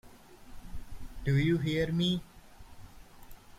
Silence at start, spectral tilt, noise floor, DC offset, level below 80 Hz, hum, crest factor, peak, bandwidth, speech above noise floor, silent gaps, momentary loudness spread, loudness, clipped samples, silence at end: 0.05 s; -6.5 dB/octave; -52 dBFS; under 0.1%; -48 dBFS; none; 16 dB; -18 dBFS; 15.5 kHz; 23 dB; none; 22 LU; -30 LUFS; under 0.1%; 0.1 s